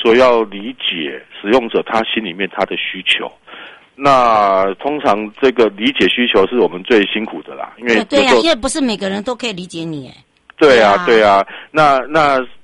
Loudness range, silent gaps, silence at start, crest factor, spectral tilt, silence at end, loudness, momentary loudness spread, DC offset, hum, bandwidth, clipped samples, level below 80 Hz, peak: 3 LU; none; 0 s; 14 dB; -4 dB/octave; 0.05 s; -14 LUFS; 14 LU; under 0.1%; none; 11.5 kHz; under 0.1%; -46 dBFS; 0 dBFS